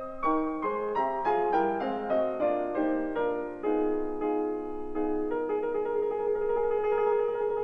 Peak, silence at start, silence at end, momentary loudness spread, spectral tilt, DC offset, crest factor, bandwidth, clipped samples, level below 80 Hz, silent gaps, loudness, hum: -14 dBFS; 0 s; 0 s; 5 LU; -8 dB/octave; 0.2%; 14 dB; 5.2 kHz; under 0.1%; -52 dBFS; none; -29 LUFS; none